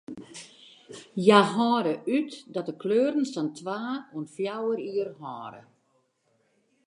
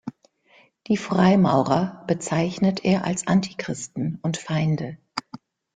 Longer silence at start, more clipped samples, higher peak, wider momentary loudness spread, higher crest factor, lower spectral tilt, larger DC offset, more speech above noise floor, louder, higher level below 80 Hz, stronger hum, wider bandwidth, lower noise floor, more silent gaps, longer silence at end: about the same, 0.1 s vs 0.05 s; neither; about the same, -2 dBFS vs -4 dBFS; first, 23 LU vs 13 LU; first, 26 dB vs 18 dB; about the same, -5.5 dB/octave vs -6 dB/octave; neither; first, 44 dB vs 36 dB; second, -26 LUFS vs -23 LUFS; second, -78 dBFS vs -58 dBFS; neither; first, 11 kHz vs 9.4 kHz; first, -71 dBFS vs -58 dBFS; neither; first, 1.25 s vs 0.4 s